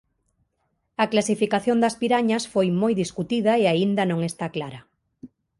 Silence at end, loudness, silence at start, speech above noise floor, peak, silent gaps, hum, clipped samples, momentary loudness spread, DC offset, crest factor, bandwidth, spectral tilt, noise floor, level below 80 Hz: 0.35 s; -22 LUFS; 1 s; 51 dB; -6 dBFS; none; none; under 0.1%; 10 LU; under 0.1%; 18 dB; 11.5 kHz; -5.5 dB/octave; -73 dBFS; -62 dBFS